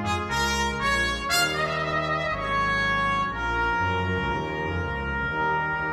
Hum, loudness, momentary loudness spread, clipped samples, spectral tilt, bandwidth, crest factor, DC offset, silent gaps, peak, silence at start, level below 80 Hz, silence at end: none; -25 LUFS; 5 LU; under 0.1%; -4 dB/octave; 16 kHz; 14 dB; under 0.1%; none; -10 dBFS; 0 s; -40 dBFS; 0 s